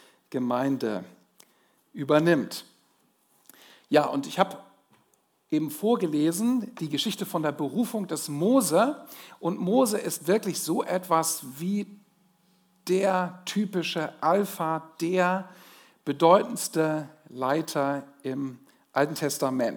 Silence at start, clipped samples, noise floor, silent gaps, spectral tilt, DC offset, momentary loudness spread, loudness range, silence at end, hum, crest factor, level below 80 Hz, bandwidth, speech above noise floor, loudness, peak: 0.3 s; under 0.1%; -68 dBFS; none; -5 dB/octave; under 0.1%; 11 LU; 3 LU; 0 s; none; 22 dB; -88 dBFS; over 20 kHz; 42 dB; -27 LUFS; -6 dBFS